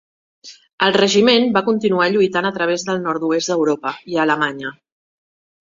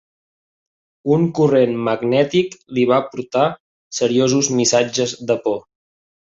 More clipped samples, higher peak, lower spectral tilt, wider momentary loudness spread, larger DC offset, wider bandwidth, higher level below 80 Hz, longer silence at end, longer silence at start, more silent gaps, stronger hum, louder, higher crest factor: neither; about the same, 0 dBFS vs -2 dBFS; about the same, -4 dB/octave vs -4.5 dB/octave; about the same, 9 LU vs 8 LU; neither; about the same, 7.8 kHz vs 8 kHz; about the same, -62 dBFS vs -60 dBFS; about the same, 0.9 s vs 0.8 s; second, 0.45 s vs 1.05 s; second, 0.73-0.78 s vs 3.60-3.91 s; neither; about the same, -17 LUFS vs -18 LUFS; about the same, 18 dB vs 16 dB